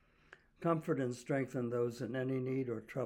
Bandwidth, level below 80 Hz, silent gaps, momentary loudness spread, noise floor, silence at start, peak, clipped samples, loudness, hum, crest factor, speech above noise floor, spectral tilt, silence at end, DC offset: 17 kHz; -72 dBFS; none; 4 LU; -64 dBFS; 0.3 s; -20 dBFS; under 0.1%; -38 LUFS; none; 18 dB; 27 dB; -7.5 dB/octave; 0 s; under 0.1%